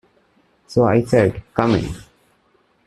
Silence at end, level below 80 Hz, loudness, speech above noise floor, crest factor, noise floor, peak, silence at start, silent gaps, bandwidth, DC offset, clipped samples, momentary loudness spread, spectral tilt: 0.85 s; -44 dBFS; -18 LUFS; 43 dB; 20 dB; -60 dBFS; 0 dBFS; 0.7 s; none; 12.5 kHz; under 0.1%; under 0.1%; 12 LU; -7.5 dB/octave